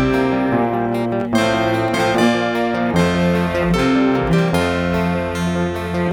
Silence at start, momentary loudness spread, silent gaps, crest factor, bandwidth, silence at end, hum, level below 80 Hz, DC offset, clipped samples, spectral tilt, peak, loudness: 0 s; 5 LU; none; 16 dB; 15.5 kHz; 0 s; none; -36 dBFS; under 0.1%; under 0.1%; -6.5 dB/octave; -2 dBFS; -17 LUFS